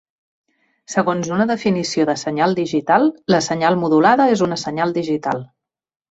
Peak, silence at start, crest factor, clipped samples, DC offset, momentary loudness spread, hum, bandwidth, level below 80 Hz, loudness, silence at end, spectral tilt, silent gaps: -2 dBFS; 0.9 s; 16 dB; under 0.1%; under 0.1%; 7 LU; none; 8.2 kHz; -60 dBFS; -18 LUFS; 0.65 s; -5 dB/octave; none